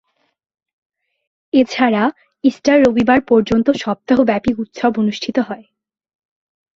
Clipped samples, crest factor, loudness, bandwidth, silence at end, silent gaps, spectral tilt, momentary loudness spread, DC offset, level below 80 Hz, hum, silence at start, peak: under 0.1%; 16 dB; -16 LUFS; 7.6 kHz; 1.15 s; none; -6 dB/octave; 8 LU; under 0.1%; -48 dBFS; none; 1.55 s; -2 dBFS